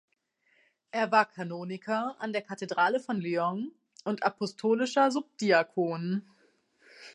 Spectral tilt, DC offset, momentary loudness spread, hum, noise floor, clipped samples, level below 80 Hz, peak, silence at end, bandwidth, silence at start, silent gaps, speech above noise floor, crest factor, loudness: -5.5 dB/octave; under 0.1%; 11 LU; none; -72 dBFS; under 0.1%; -84 dBFS; -8 dBFS; 0.05 s; 11.5 kHz; 0.95 s; none; 43 dB; 22 dB; -30 LUFS